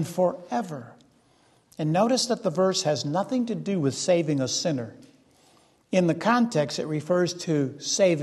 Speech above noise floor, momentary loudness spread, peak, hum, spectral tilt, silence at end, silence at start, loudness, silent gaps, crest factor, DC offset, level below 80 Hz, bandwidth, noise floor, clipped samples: 37 dB; 8 LU; -8 dBFS; none; -5 dB/octave; 0 s; 0 s; -25 LUFS; none; 18 dB; under 0.1%; -70 dBFS; 12.5 kHz; -62 dBFS; under 0.1%